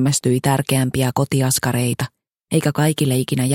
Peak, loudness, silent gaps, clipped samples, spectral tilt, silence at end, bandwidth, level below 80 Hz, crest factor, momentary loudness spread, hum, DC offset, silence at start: -4 dBFS; -19 LUFS; none; under 0.1%; -5 dB/octave; 0 s; 17 kHz; -50 dBFS; 14 dB; 5 LU; none; under 0.1%; 0 s